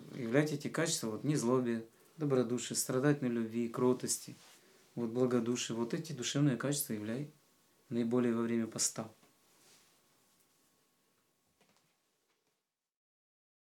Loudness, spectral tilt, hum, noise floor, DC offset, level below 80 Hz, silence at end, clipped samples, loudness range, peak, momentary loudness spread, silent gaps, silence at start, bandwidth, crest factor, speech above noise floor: -35 LUFS; -4.5 dB/octave; none; -86 dBFS; under 0.1%; under -90 dBFS; 4.5 s; under 0.1%; 4 LU; -14 dBFS; 9 LU; none; 0 s; 17.5 kHz; 22 dB; 52 dB